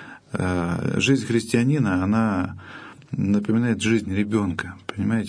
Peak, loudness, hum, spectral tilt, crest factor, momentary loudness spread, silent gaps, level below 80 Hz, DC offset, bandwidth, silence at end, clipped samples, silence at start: -8 dBFS; -23 LUFS; none; -6 dB/octave; 16 dB; 12 LU; none; -52 dBFS; under 0.1%; 11 kHz; 0 s; under 0.1%; 0 s